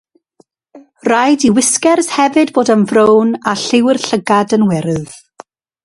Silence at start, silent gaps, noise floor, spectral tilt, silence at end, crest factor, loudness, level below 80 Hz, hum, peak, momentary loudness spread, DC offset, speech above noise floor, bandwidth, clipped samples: 0.75 s; none; -54 dBFS; -4.5 dB/octave; 0.7 s; 14 dB; -12 LUFS; -52 dBFS; none; 0 dBFS; 7 LU; under 0.1%; 42 dB; 11.5 kHz; under 0.1%